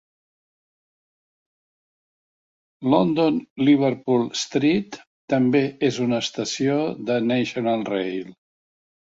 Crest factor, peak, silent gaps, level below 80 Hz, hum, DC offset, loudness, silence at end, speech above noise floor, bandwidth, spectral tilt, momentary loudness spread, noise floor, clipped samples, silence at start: 20 dB; -4 dBFS; 3.50-3.56 s, 5.07-5.28 s; -64 dBFS; none; under 0.1%; -22 LUFS; 0.85 s; over 69 dB; 7.8 kHz; -5.5 dB/octave; 8 LU; under -90 dBFS; under 0.1%; 2.8 s